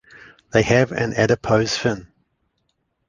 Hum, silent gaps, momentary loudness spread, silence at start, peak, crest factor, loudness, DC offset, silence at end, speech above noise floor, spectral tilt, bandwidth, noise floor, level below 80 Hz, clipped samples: none; none; 6 LU; 0.55 s; -2 dBFS; 20 dB; -19 LUFS; under 0.1%; 1.05 s; 53 dB; -5.5 dB/octave; 9.8 kHz; -71 dBFS; -48 dBFS; under 0.1%